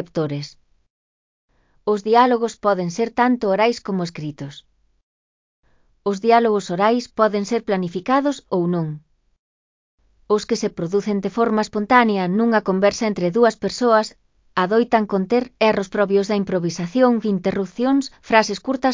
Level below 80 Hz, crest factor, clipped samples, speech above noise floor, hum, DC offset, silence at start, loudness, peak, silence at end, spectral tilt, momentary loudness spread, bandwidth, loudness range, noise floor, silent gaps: -58 dBFS; 20 dB; under 0.1%; over 71 dB; none; under 0.1%; 0 s; -19 LUFS; 0 dBFS; 0 s; -5.5 dB/octave; 9 LU; 7.6 kHz; 5 LU; under -90 dBFS; 0.90-1.48 s, 5.03-5.63 s, 9.39-9.98 s